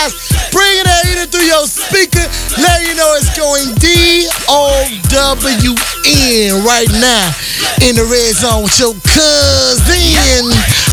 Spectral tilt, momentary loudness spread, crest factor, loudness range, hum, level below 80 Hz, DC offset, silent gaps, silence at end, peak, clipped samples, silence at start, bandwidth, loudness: -3 dB/octave; 5 LU; 10 dB; 1 LU; none; -20 dBFS; under 0.1%; none; 0 s; 0 dBFS; 0.5%; 0 s; over 20 kHz; -8 LUFS